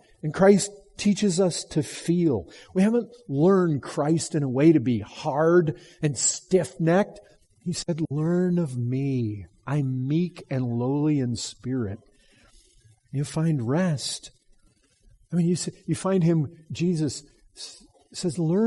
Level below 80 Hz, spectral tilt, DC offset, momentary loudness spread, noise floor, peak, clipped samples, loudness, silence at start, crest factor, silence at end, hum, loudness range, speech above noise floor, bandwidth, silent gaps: -60 dBFS; -6 dB/octave; under 0.1%; 11 LU; -62 dBFS; -6 dBFS; under 0.1%; -25 LUFS; 0.25 s; 20 dB; 0 s; none; 6 LU; 38 dB; 11.5 kHz; none